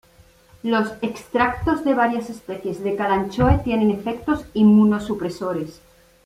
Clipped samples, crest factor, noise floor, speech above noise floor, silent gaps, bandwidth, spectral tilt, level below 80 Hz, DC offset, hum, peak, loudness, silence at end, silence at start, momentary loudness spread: under 0.1%; 16 dB; -52 dBFS; 32 dB; none; 12.5 kHz; -7.5 dB/octave; -38 dBFS; under 0.1%; none; -4 dBFS; -21 LUFS; 0.5 s; 0.65 s; 13 LU